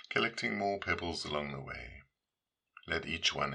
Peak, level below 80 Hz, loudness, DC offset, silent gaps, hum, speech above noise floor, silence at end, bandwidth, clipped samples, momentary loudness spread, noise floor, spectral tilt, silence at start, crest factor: -16 dBFS; -60 dBFS; -35 LUFS; under 0.1%; none; none; over 54 dB; 0 s; 11 kHz; under 0.1%; 13 LU; under -90 dBFS; -3.5 dB/octave; 0.1 s; 22 dB